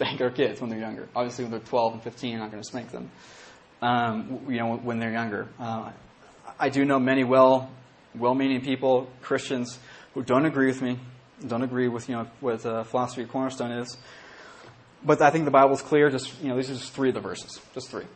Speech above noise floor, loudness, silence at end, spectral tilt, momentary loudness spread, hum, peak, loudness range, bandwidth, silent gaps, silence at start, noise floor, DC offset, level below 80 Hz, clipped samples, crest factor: 24 dB; -26 LUFS; 0 s; -6 dB/octave; 18 LU; none; -4 dBFS; 7 LU; 8.8 kHz; none; 0 s; -50 dBFS; under 0.1%; -66 dBFS; under 0.1%; 22 dB